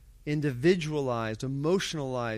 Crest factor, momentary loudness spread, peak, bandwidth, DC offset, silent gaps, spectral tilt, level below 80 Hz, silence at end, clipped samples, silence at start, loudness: 18 dB; 7 LU; -12 dBFS; 14.5 kHz; under 0.1%; none; -6 dB/octave; -54 dBFS; 0 s; under 0.1%; 0.05 s; -29 LUFS